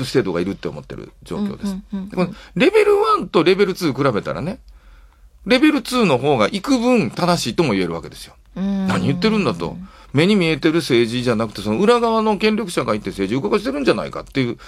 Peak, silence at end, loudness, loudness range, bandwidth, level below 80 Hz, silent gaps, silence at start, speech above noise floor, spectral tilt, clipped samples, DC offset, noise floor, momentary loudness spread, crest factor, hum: 0 dBFS; 0 s; -18 LUFS; 2 LU; 15.5 kHz; -46 dBFS; none; 0 s; 28 dB; -6 dB/octave; under 0.1%; under 0.1%; -46 dBFS; 14 LU; 18 dB; none